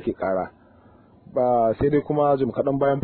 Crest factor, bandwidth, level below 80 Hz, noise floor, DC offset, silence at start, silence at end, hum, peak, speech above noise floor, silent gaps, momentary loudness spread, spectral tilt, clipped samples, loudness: 14 dB; 4.5 kHz; -48 dBFS; -52 dBFS; under 0.1%; 0 s; 0 s; none; -8 dBFS; 31 dB; none; 8 LU; -12 dB/octave; under 0.1%; -22 LUFS